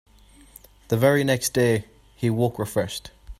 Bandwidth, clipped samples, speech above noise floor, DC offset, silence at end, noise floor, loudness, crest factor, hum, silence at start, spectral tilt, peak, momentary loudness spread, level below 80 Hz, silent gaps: 16 kHz; under 0.1%; 28 dB; under 0.1%; 0.05 s; -50 dBFS; -23 LUFS; 18 dB; none; 0.9 s; -5.5 dB/octave; -6 dBFS; 9 LU; -50 dBFS; none